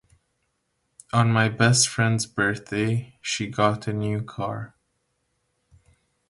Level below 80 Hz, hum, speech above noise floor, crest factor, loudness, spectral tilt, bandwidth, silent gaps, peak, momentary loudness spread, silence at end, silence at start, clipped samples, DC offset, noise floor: -56 dBFS; none; 51 dB; 20 dB; -23 LUFS; -4 dB/octave; 11.5 kHz; none; -6 dBFS; 12 LU; 1.65 s; 1.15 s; under 0.1%; under 0.1%; -74 dBFS